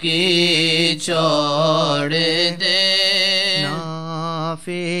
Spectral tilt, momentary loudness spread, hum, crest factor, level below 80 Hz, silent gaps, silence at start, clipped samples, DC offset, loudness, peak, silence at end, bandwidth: -3.5 dB/octave; 11 LU; none; 14 dB; -64 dBFS; none; 0 s; under 0.1%; 0.8%; -16 LUFS; -4 dBFS; 0 s; 15 kHz